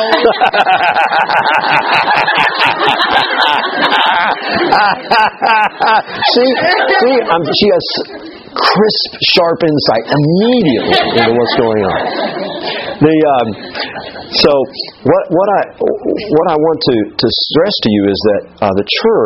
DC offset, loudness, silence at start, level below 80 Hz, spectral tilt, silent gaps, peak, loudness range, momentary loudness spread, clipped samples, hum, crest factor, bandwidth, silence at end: under 0.1%; -11 LUFS; 0 s; -46 dBFS; -6 dB/octave; none; 0 dBFS; 3 LU; 8 LU; 0.1%; none; 12 dB; 11 kHz; 0 s